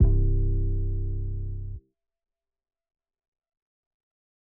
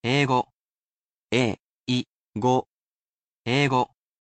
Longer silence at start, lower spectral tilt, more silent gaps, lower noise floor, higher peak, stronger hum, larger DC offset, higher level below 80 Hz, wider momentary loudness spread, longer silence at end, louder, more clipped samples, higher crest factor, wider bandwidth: about the same, 0 s vs 0.05 s; first, -15 dB/octave vs -5.5 dB/octave; second, none vs 0.54-1.28 s, 1.62-1.86 s, 2.10-2.33 s, 2.71-3.44 s; second, -46 dBFS vs under -90 dBFS; about the same, -8 dBFS vs -8 dBFS; neither; neither; first, -30 dBFS vs -64 dBFS; about the same, 14 LU vs 14 LU; first, 2.8 s vs 0.35 s; second, -29 LUFS vs -25 LUFS; neither; about the same, 18 dB vs 18 dB; second, 1.1 kHz vs 9 kHz